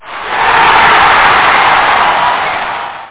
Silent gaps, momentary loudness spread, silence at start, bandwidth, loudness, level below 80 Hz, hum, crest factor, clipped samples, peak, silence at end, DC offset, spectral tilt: none; 11 LU; 0.05 s; 4 kHz; -7 LUFS; -38 dBFS; none; 8 dB; under 0.1%; 0 dBFS; 0 s; 0.8%; -6 dB/octave